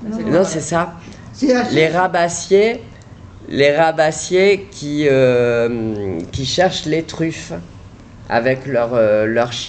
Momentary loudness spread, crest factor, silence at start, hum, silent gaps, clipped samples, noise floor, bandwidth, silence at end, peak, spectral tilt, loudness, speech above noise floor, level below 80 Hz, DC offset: 10 LU; 14 dB; 0 s; none; none; under 0.1%; -38 dBFS; 9 kHz; 0 s; -2 dBFS; -5 dB/octave; -16 LUFS; 22 dB; -44 dBFS; under 0.1%